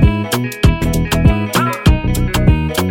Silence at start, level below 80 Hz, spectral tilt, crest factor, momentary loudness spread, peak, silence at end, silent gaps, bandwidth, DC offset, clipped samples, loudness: 0 s; -18 dBFS; -6 dB/octave; 12 dB; 3 LU; 0 dBFS; 0 s; none; 17 kHz; under 0.1%; under 0.1%; -15 LUFS